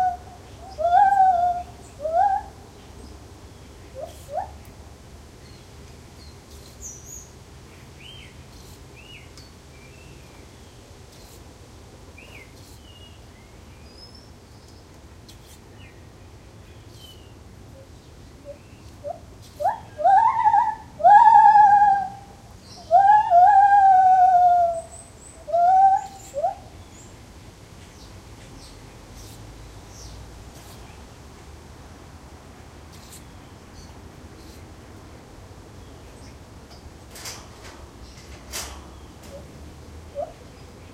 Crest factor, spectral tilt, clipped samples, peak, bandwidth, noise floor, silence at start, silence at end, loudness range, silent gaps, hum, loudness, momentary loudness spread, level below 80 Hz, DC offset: 22 dB; -4 dB/octave; under 0.1%; -2 dBFS; 15 kHz; -46 dBFS; 0 s; 0.6 s; 28 LU; none; none; -18 LUFS; 30 LU; -48 dBFS; under 0.1%